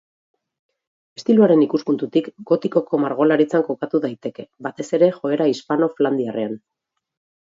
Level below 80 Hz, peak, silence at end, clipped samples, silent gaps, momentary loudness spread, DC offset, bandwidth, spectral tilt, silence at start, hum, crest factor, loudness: -72 dBFS; -2 dBFS; 0.85 s; under 0.1%; none; 14 LU; under 0.1%; 7.8 kHz; -7 dB/octave; 1.2 s; none; 18 dB; -19 LUFS